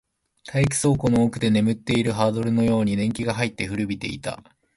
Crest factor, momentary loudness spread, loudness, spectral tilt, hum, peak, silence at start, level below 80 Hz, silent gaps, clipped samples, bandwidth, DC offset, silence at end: 16 dB; 9 LU; -22 LUFS; -5.5 dB/octave; none; -6 dBFS; 0.45 s; -48 dBFS; none; under 0.1%; 11.5 kHz; under 0.1%; 0.35 s